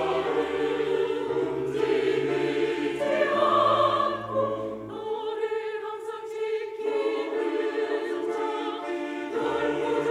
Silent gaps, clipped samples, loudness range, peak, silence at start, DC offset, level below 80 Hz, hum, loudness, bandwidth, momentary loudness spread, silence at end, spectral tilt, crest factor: none; under 0.1%; 5 LU; -10 dBFS; 0 s; under 0.1%; -64 dBFS; none; -27 LUFS; 11.5 kHz; 10 LU; 0 s; -5.5 dB/octave; 16 dB